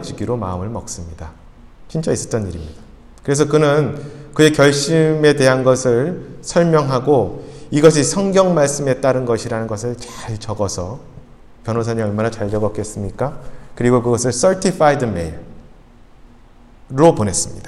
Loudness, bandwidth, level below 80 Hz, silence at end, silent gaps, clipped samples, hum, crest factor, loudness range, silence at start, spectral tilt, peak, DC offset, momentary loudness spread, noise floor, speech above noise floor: -16 LUFS; 13.5 kHz; -42 dBFS; 0 s; none; under 0.1%; none; 18 dB; 8 LU; 0 s; -5 dB/octave; 0 dBFS; under 0.1%; 16 LU; -44 dBFS; 27 dB